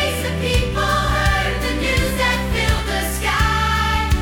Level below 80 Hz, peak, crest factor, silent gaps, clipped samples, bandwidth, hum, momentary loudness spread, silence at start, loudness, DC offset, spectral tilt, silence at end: -24 dBFS; -4 dBFS; 14 dB; none; under 0.1%; 18 kHz; none; 3 LU; 0 s; -18 LUFS; under 0.1%; -4.5 dB/octave; 0 s